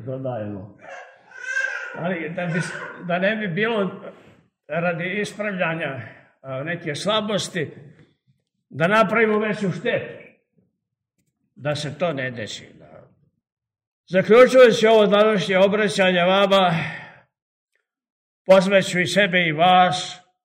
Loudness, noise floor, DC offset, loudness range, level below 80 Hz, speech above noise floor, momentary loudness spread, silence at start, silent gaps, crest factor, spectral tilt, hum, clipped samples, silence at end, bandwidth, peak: -19 LUFS; -79 dBFS; under 0.1%; 12 LU; -66 dBFS; 59 dB; 18 LU; 0 s; 13.52-13.57 s, 13.87-14.04 s, 17.42-17.67 s, 18.12-18.45 s; 20 dB; -5 dB/octave; none; under 0.1%; 0.25 s; 14.5 kHz; -2 dBFS